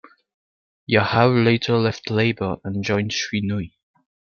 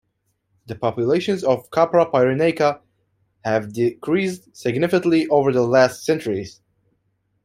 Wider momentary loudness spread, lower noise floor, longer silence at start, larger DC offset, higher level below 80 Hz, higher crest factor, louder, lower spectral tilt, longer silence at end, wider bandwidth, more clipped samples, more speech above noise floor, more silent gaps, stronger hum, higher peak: about the same, 10 LU vs 10 LU; first, under -90 dBFS vs -71 dBFS; first, 0.9 s vs 0.7 s; neither; about the same, -56 dBFS vs -60 dBFS; about the same, 20 dB vs 18 dB; about the same, -20 LUFS vs -20 LUFS; about the same, -6 dB/octave vs -6 dB/octave; second, 0.65 s vs 0.95 s; second, 7 kHz vs 15 kHz; neither; first, over 70 dB vs 52 dB; neither; neither; about the same, -2 dBFS vs -2 dBFS